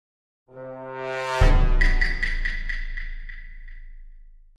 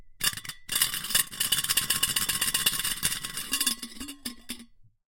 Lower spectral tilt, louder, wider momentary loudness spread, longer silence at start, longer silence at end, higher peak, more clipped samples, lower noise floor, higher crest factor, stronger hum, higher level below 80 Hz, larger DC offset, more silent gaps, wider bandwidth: first, -5.5 dB/octave vs 0.5 dB/octave; about the same, -25 LUFS vs -26 LUFS; first, 22 LU vs 15 LU; first, 0.55 s vs 0 s; about the same, 0.35 s vs 0.35 s; about the same, -6 dBFS vs -6 dBFS; neither; second, -45 dBFS vs -52 dBFS; second, 18 dB vs 24 dB; neither; first, -24 dBFS vs -52 dBFS; neither; neither; second, 8 kHz vs 17 kHz